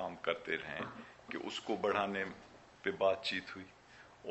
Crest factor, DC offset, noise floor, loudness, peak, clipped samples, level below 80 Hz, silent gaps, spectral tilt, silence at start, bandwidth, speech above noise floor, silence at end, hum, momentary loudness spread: 20 dB; under 0.1%; -59 dBFS; -38 LUFS; -18 dBFS; under 0.1%; -72 dBFS; none; -4.5 dB/octave; 0 s; 8.2 kHz; 21 dB; 0 s; none; 21 LU